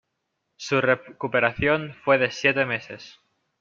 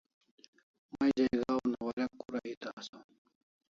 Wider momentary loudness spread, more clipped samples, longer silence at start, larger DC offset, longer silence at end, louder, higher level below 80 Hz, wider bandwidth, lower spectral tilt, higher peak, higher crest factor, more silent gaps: second, 12 LU vs 17 LU; neither; second, 0.6 s vs 0.95 s; neither; second, 0.5 s vs 0.7 s; first, -23 LUFS vs -34 LUFS; first, -56 dBFS vs -68 dBFS; about the same, 7.4 kHz vs 7.4 kHz; about the same, -5 dB/octave vs -6 dB/octave; first, -4 dBFS vs -18 dBFS; about the same, 22 dB vs 18 dB; second, none vs 1.93-1.97 s, 2.57-2.61 s, 2.73-2.77 s, 2.89-2.93 s